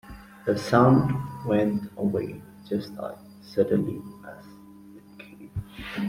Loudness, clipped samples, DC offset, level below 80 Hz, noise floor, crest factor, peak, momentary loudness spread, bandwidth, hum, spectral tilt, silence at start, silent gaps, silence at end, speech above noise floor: -25 LUFS; under 0.1%; under 0.1%; -54 dBFS; -48 dBFS; 22 dB; -6 dBFS; 25 LU; 16 kHz; none; -8 dB/octave; 0.05 s; none; 0 s; 23 dB